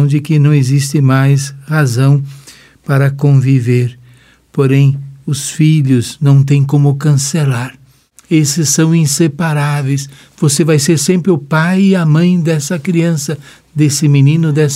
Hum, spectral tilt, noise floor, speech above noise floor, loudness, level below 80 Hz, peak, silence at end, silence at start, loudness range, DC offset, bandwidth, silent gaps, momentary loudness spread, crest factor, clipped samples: none; -6 dB/octave; -45 dBFS; 35 dB; -12 LUFS; -54 dBFS; 0 dBFS; 0 s; 0 s; 2 LU; under 0.1%; 15 kHz; none; 9 LU; 10 dB; under 0.1%